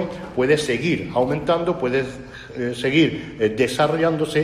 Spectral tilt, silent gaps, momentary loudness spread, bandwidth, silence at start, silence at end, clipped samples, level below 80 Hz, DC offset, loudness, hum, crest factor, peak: -5.5 dB/octave; none; 9 LU; 13.5 kHz; 0 s; 0 s; under 0.1%; -48 dBFS; under 0.1%; -21 LUFS; none; 16 dB; -6 dBFS